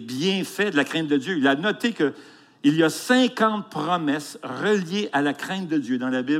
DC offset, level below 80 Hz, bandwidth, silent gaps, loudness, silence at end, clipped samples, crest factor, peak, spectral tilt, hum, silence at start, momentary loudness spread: under 0.1%; -78 dBFS; 16 kHz; none; -23 LUFS; 0 s; under 0.1%; 16 dB; -6 dBFS; -5 dB/octave; none; 0 s; 6 LU